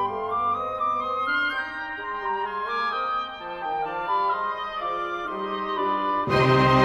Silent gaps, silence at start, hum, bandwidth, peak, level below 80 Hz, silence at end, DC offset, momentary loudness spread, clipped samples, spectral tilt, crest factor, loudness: none; 0 s; none; 12 kHz; -6 dBFS; -52 dBFS; 0 s; under 0.1%; 8 LU; under 0.1%; -6.5 dB/octave; 18 dB; -26 LUFS